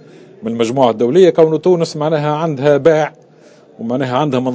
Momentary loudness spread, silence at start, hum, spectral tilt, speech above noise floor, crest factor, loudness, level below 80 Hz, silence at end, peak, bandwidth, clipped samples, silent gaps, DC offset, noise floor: 12 LU; 0.4 s; none; -7 dB/octave; 31 dB; 14 dB; -14 LUFS; -62 dBFS; 0 s; 0 dBFS; 8 kHz; 0.2%; none; under 0.1%; -44 dBFS